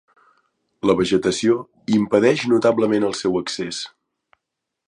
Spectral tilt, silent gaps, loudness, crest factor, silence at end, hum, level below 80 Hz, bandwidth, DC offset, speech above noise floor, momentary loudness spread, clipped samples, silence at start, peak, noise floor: -5 dB/octave; none; -19 LUFS; 18 dB; 1 s; none; -56 dBFS; 11 kHz; under 0.1%; 62 dB; 9 LU; under 0.1%; 0.85 s; -2 dBFS; -81 dBFS